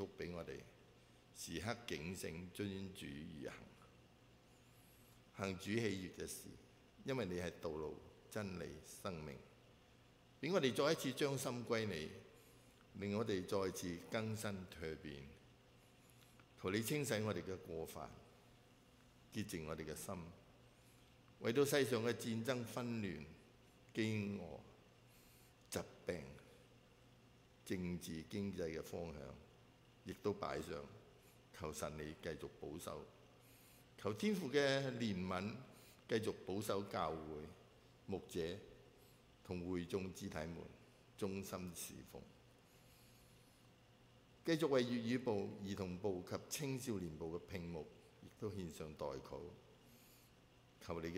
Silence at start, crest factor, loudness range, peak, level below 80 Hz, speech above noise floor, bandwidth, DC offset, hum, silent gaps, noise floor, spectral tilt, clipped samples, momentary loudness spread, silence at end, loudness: 0 s; 24 dB; 9 LU; -22 dBFS; -70 dBFS; 24 dB; 16 kHz; under 0.1%; none; none; -68 dBFS; -5 dB/octave; under 0.1%; 24 LU; 0 s; -45 LUFS